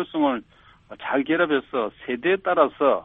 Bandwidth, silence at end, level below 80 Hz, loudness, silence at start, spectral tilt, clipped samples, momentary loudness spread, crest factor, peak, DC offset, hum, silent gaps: 4 kHz; 0 s; -62 dBFS; -23 LUFS; 0 s; -8.5 dB/octave; under 0.1%; 9 LU; 20 dB; -4 dBFS; under 0.1%; none; none